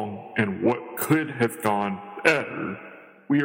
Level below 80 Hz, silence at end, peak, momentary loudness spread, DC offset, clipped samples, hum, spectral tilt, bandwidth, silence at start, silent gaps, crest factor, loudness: -68 dBFS; 0 s; -4 dBFS; 11 LU; under 0.1%; under 0.1%; none; -5.5 dB/octave; 16.5 kHz; 0 s; none; 22 dB; -25 LUFS